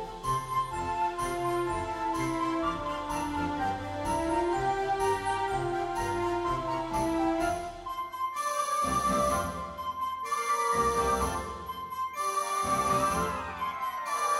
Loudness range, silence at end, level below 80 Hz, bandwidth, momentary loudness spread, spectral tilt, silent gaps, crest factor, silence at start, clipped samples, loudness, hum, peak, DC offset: 2 LU; 0 s; -48 dBFS; 16 kHz; 7 LU; -4.5 dB/octave; none; 14 dB; 0 s; under 0.1%; -30 LUFS; none; -16 dBFS; under 0.1%